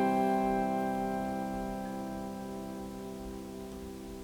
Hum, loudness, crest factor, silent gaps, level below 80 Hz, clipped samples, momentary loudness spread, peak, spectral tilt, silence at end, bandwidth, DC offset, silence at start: none; -35 LUFS; 16 dB; none; -54 dBFS; under 0.1%; 14 LU; -18 dBFS; -6.5 dB/octave; 0 s; 19.5 kHz; under 0.1%; 0 s